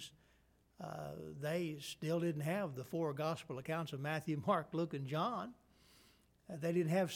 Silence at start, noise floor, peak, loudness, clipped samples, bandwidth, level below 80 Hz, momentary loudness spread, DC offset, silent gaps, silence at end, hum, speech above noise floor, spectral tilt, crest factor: 0 s; -72 dBFS; -22 dBFS; -40 LUFS; under 0.1%; 17.5 kHz; -74 dBFS; 11 LU; under 0.1%; none; 0 s; none; 33 dB; -6.5 dB/octave; 18 dB